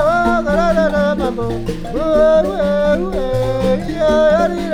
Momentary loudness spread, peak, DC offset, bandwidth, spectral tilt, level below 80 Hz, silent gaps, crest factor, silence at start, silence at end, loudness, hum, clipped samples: 8 LU; -2 dBFS; under 0.1%; 14 kHz; -6.5 dB/octave; -28 dBFS; none; 12 dB; 0 s; 0 s; -15 LUFS; none; under 0.1%